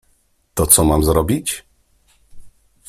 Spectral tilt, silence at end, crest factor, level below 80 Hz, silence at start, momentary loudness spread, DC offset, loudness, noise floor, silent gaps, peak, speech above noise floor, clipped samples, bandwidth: -4.5 dB/octave; 0.4 s; 20 dB; -32 dBFS; 0.55 s; 16 LU; under 0.1%; -15 LUFS; -60 dBFS; none; 0 dBFS; 45 dB; under 0.1%; 16 kHz